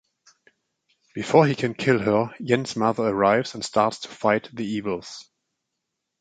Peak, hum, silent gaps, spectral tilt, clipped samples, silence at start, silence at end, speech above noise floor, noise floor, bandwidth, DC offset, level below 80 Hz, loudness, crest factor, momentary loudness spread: -4 dBFS; none; none; -5.5 dB/octave; under 0.1%; 1.15 s; 1 s; 58 dB; -81 dBFS; 9.4 kHz; under 0.1%; -62 dBFS; -23 LUFS; 20 dB; 13 LU